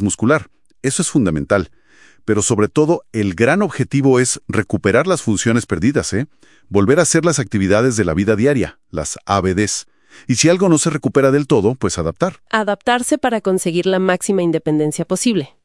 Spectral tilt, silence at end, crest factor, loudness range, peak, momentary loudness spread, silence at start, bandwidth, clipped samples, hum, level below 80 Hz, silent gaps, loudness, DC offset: -5 dB/octave; 0.2 s; 16 dB; 1 LU; 0 dBFS; 7 LU; 0 s; 12 kHz; under 0.1%; none; -46 dBFS; none; -16 LUFS; 0.2%